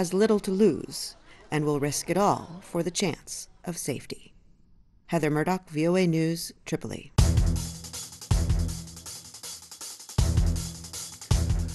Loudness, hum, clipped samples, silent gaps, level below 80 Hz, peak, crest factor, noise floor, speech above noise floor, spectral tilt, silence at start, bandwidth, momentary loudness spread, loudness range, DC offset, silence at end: -28 LUFS; none; under 0.1%; none; -34 dBFS; -8 dBFS; 20 dB; -57 dBFS; 30 dB; -5.5 dB/octave; 0 s; 12.5 kHz; 15 LU; 4 LU; under 0.1%; 0 s